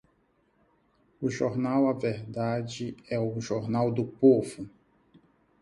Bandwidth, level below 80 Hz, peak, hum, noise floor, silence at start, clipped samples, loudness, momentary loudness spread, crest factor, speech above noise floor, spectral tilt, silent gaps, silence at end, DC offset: 11.5 kHz; -64 dBFS; -8 dBFS; none; -69 dBFS; 1.2 s; under 0.1%; -28 LUFS; 14 LU; 20 dB; 42 dB; -7 dB/octave; none; 0.95 s; under 0.1%